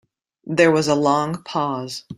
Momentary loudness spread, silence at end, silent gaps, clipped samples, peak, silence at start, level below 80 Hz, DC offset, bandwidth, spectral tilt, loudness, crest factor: 9 LU; 0.05 s; none; under 0.1%; -2 dBFS; 0.45 s; -62 dBFS; under 0.1%; 15.5 kHz; -5 dB/octave; -19 LUFS; 18 dB